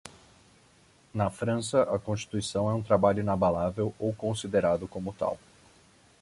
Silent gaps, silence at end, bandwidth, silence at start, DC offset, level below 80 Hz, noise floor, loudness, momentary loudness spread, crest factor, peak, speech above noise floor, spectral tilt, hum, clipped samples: none; 0.85 s; 11.5 kHz; 0.05 s; under 0.1%; -54 dBFS; -61 dBFS; -29 LUFS; 9 LU; 20 dB; -10 dBFS; 33 dB; -6 dB/octave; none; under 0.1%